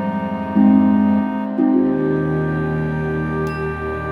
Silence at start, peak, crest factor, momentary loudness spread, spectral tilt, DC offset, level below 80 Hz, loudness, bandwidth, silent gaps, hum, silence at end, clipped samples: 0 s; -2 dBFS; 14 dB; 9 LU; -10 dB/octave; under 0.1%; -40 dBFS; -18 LUFS; 5.2 kHz; none; none; 0 s; under 0.1%